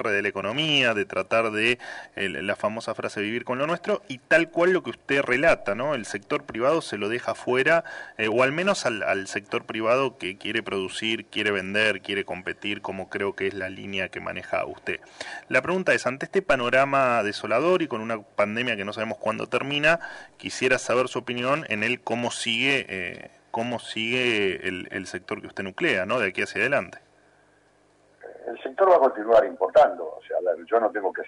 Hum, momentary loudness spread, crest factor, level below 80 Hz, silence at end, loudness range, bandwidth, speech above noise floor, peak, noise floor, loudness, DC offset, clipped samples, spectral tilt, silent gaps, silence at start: 50 Hz at -65 dBFS; 12 LU; 16 dB; -60 dBFS; 0 s; 4 LU; 11 kHz; 36 dB; -8 dBFS; -61 dBFS; -24 LUFS; under 0.1%; under 0.1%; -4 dB/octave; none; 0 s